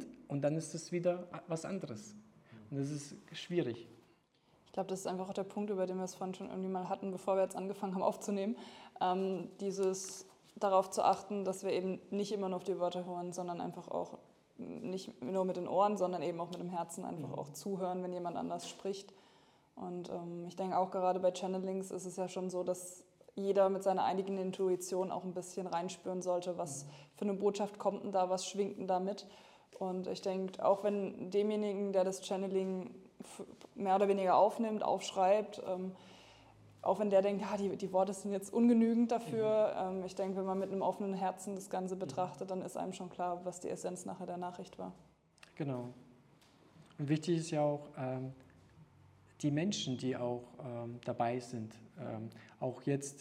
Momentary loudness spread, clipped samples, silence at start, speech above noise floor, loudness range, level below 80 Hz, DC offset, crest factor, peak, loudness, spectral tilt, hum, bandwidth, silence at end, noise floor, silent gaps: 14 LU; under 0.1%; 0 s; 34 dB; 8 LU; -80 dBFS; under 0.1%; 20 dB; -16 dBFS; -37 LUFS; -6 dB/octave; none; 15 kHz; 0 s; -71 dBFS; none